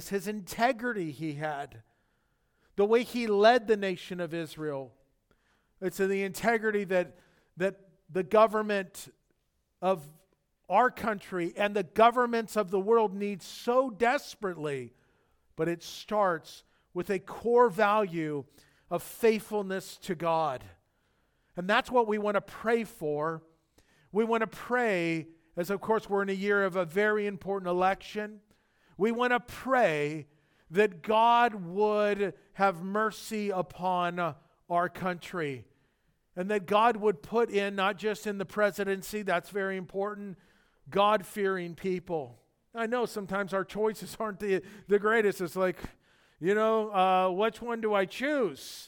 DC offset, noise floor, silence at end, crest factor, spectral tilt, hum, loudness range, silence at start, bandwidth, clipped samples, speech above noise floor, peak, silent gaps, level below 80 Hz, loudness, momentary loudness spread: under 0.1%; -76 dBFS; 0 s; 20 dB; -5 dB/octave; none; 5 LU; 0 s; 19 kHz; under 0.1%; 47 dB; -10 dBFS; none; -66 dBFS; -29 LUFS; 12 LU